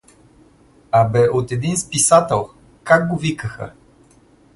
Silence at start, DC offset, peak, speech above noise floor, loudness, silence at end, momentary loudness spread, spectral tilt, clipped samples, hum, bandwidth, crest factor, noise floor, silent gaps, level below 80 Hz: 0.95 s; under 0.1%; 0 dBFS; 35 dB; -17 LUFS; 0.85 s; 20 LU; -4.5 dB/octave; under 0.1%; none; 12 kHz; 18 dB; -51 dBFS; none; -48 dBFS